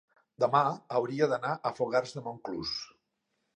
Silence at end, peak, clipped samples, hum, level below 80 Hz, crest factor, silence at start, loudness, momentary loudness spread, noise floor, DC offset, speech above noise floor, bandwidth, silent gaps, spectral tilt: 0.7 s; -10 dBFS; under 0.1%; none; -70 dBFS; 22 dB; 0.4 s; -31 LUFS; 12 LU; -80 dBFS; under 0.1%; 50 dB; 9.8 kHz; none; -5.5 dB/octave